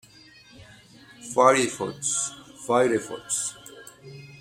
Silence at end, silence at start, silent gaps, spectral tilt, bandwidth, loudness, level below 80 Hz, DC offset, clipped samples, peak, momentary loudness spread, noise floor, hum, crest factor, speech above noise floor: 0.05 s; 0.6 s; none; -3 dB/octave; 16.5 kHz; -24 LUFS; -66 dBFS; under 0.1%; under 0.1%; -4 dBFS; 25 LU; -52 dBFS; none; 24 dB; 28 dB